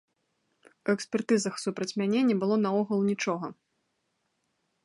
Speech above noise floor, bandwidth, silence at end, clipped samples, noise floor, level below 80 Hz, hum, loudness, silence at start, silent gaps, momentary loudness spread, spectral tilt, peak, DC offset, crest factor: 50 dB; 11.5 kHz; 1.3 s; under 0.1%; -77 dBFS; -78 dBFS; none; -28 LUFS; 0.85 s; none; 8 LU; -5.5 dB/octave; -12 dBFS; under 0.1%; 16 dB